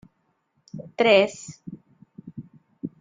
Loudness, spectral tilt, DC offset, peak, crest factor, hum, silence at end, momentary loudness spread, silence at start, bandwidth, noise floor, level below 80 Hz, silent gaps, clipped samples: -20 LUFS; -4.5 dB/octave; under 0.1%; -4 dBFS; 24 dB; none; 0.15 s; 25 LU; 0.75 s; 9.4 kHz; -71 dBFS; -70 dBFS; none; under 0.1%